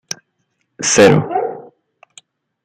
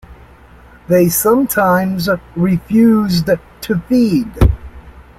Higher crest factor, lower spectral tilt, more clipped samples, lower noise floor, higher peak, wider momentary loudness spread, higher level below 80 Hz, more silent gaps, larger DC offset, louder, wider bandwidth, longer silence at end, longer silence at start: about the same, 16 dB vs 12 dB; second, -4 dB/octave vs -6 dB/octave; neither; first, -68 dBFS vs -41 dBFS; about the same, 0 dBFS vs -2 dBFS; first, 19 LU vs 7 LU; second, -54 dBFS vs -26 dBFS; neither; neither; about the same, -13 LUFS vs -14 LUFS; about the same, 15 kHz vs 16.5 kHz; first, 1.05 s vs 0.15 s; first, 0.8 s vs 0.1 s